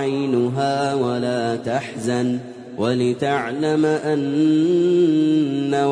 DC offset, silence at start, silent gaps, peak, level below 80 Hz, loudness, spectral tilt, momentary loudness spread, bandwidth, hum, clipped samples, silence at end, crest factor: under 0.1%; 0 s; none; -6 dBFS; -62 dBFS; -20 LUFS; -6.5 dB/octave; 7 LU; 10.5 kHz; none; under 0.1%; 0 s; 12 dB